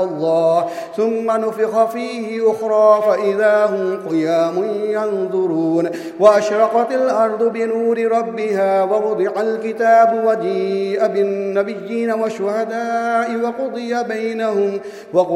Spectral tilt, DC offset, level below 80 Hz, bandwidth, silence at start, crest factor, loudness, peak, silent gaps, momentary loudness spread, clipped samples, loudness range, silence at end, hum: -6 dB/octave; under 0.1%; -70 dBFS; 13.5 kHz; 0 s; 16 dB; -17 LUFS; 0 dBFS; none; 8 LU; under 0.1%; 4 LU; 0 s; none